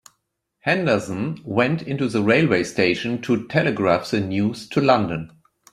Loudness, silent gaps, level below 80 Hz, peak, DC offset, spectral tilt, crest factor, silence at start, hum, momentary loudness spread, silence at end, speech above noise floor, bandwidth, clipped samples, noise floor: -21 LUFS; none; -58 dBFS; -2 dBFS; under 0.1%; -6 dB/octave; 18 dB; 0.65 s; none; 9 LU; 0.45 s; 54 dB; 13.5 kHz; under 0.1%; -74 dBFS